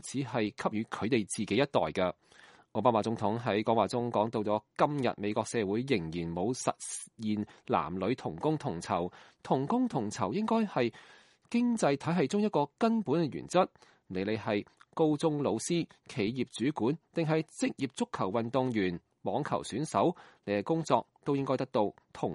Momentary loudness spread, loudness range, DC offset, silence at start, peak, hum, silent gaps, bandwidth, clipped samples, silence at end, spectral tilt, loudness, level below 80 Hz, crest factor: 6 LU; 3 LU; under 0.1%; 0.05 s; -10 dBFS; none; none; 11.5 kHz; under 0.1%; 0 s; -5.5 dB/octave; -32 LUFS; -68 dBFS; 20 dB